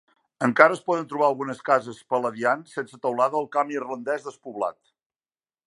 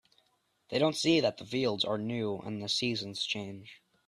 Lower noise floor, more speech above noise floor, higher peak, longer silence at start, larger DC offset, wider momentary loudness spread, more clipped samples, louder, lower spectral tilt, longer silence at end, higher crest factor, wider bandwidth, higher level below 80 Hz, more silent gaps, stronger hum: first, under -90 dBFS vs -74 dBFS; first, over 66 dB vs 42 dB; first, 0 dBFS vs -14 dBFS; second, 0.4 s vs 0.7 s; neither; about the same, 12 LU vs 10 LU; neither; first, -24 LUFS vs -31 LUFS; about the same, -5.5 dB/octave vs -4.5 dB/octave; first, 0.95 s vs 0.3 s; about the same, 24 dB vs 20 dB; second, 11.5 kHz vs 13.5 kHz; about the same, -76 dBFS vs -72 dBFS; neither; neither